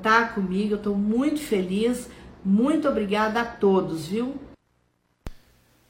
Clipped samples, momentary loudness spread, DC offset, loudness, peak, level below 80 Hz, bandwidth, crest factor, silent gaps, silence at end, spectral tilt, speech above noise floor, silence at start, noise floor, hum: under 0.1%; 20 LU; under 0.1%; -24 LUFS; -4 dBFS; -50 dBFS; 16.5 kHz; 20 dB; none; 0.55 s; -6 dB/octave; 45 dB; 0 s; -68 dBFS; none